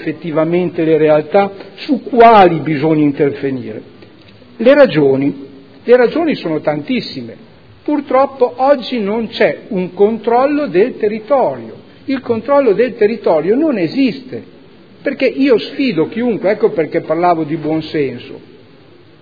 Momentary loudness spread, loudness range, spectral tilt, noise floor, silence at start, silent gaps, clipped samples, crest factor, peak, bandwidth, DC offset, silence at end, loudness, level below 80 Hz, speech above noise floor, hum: 14 LU; 4 LU; -8.5 dB/octave; -43 dBFS; 0 s; none; 0.2%; 14 dB; 0 dBFS; 5.4 kHz; 0.4%; 0.8 s; -13 LUFS; -54 dBFS; 30 dB; none